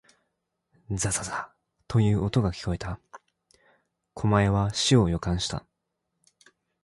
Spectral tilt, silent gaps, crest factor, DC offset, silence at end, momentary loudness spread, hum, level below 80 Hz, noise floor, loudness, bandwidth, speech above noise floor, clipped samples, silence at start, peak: -5 dB/octave; none; 20 dB; under 0.1%; 1.25 s; 16 LU; none; -44 dBFS; -81 dBFS; -26 LUFS; 11.5 kHz; 56 dB; under 0.1%; 0.9 s; -8 dBFS